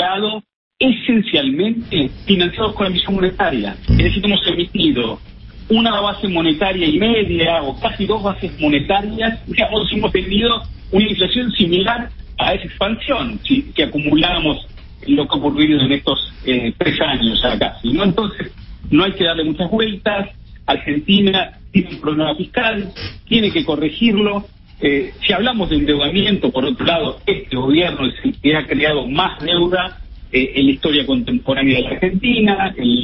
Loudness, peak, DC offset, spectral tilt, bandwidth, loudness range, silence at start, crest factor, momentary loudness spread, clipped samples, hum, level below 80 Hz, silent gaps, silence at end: -16 LUFS; 0 dBFS; under 0.1%; -10.5 dB/octave; 5.8 kHz; 1 LU; 0 s; 16 dB; 6 LU; under 0.1%; none; -32 dBFS; 0.56-0.71 s; 0 s